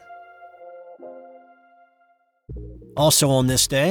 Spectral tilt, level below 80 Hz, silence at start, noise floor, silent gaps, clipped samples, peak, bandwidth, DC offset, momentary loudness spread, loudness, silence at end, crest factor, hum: -3.5 dB/octave; -46 dBFS; 0.1 s; -63 dBFS; none; under 0.1%; -6 dBFS; 19 kHz; under 0.1%; 26 LU; -18 LUFS; 0 s; 18 dB; none